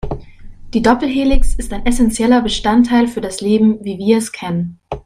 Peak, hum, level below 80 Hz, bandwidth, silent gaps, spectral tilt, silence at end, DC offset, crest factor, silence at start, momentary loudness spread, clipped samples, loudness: 0 dBFS; none; -24 dBFS; 15 kHz; none; -5 dB/octave; 0.05 s; under 0.1%; 14 dB; 0.05 s; 10 LU; under 0.1%; -15 LUFS